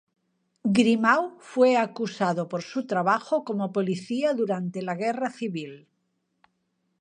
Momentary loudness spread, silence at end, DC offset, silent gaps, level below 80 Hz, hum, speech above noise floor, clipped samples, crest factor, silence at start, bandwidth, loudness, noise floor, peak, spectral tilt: 10 LU; 1.25 s; under 0.1%; none; -74 dBFS; none; 50 dB; under 0.1%; 20 dB; 0.65 s; 10 kHz; -25 LUFS; -75 dBFS; -6 dBFS; -6 dB/octave